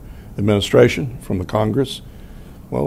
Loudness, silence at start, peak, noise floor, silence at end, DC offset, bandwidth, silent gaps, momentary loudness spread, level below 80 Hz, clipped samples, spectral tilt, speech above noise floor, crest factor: -18 LUFS; 0 s; -2 dBFS; -37 dBFS; 0 s; under 0.1%; 16 kHz; none; 13 LU; -40 dBFS; under 0.1%; -6 dB/octave; 20 dB; 18 dB